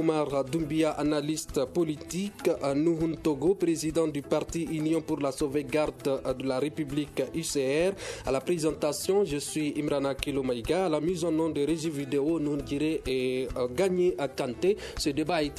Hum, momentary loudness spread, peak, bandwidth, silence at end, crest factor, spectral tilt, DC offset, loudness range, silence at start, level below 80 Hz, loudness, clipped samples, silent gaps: none; 4 LU; -10 dBFS; 14 kHz; 0 s; 18 dB; -5.5 dB/octave; under 0.1%; 1 LU; 0 s; -50 dBFS; -29 LUFS; under 0.1%; none